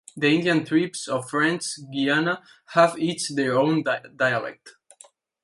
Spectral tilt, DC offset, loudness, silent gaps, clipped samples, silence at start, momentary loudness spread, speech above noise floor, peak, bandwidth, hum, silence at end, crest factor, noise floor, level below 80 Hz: -4.5 dB/octave; under 0.1%; -23 LUFS; none; under 0.1%; 0.15 s; 8 LU; 31 dB; -4 dBFS; 11.5 kHz; none; 0.75 s; 20 dB; -54 dBFS; -70 dBFS